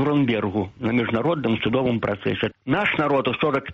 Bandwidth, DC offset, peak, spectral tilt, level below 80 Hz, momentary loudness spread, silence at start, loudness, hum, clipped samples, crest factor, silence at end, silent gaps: 7.2 kHz; under 0.1%; -8 dBFS; -8 dB/octave; -52 dBFS; 5 LU; 0 s; -22 LUFS; none; under 0.1%; 14 dB; 0 s; none